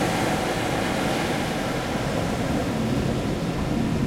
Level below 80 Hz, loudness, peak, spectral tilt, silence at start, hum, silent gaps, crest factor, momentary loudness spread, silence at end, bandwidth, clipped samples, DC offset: -38 dBFS; -25 LUFS; -10 dBFS; -5.5 dB/octave; 0 s; none; none; 14 dB; 2 LU; 0 s; 16.5 kHz; under 0.1%; under 0.1%